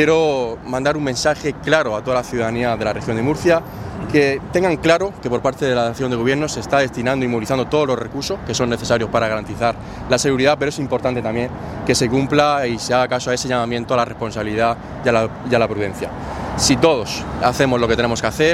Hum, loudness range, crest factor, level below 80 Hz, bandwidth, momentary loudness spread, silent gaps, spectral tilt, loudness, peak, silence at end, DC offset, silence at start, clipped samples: none; 1 LU; 18 dB; -40 dBFS; 15.5 kHz; 7 LU; none; -4.5 dB/octave; -18 LUFS; 0 dBFS; 0 s; under 0.1%; 0 s; under 0.1%